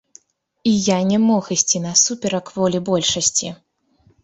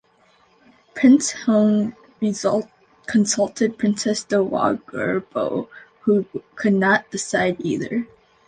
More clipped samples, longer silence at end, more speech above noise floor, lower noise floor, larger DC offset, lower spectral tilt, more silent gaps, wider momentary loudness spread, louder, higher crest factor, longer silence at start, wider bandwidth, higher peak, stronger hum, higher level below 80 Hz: neither; first, 0.7 s vs 0.4 s; about the same, 40 dB vs 38 dB; about the same, -58 dBFS vs -58 dBFS; neither; second, -3.5 dB/octave vs -5 dB/octave; neither; second, 8 LU vs 11 LU; first, -17 LUFS vs -21 LUFS; about the same, 18 dB vs 18 dB; second, 0.65 s vs 0.95 s; second, 8.4 kHz vs 9.6 kHz; about the same, -2 dBFS vs -4 dBFS; neither; first, -56 dBFS vs -62 dBFS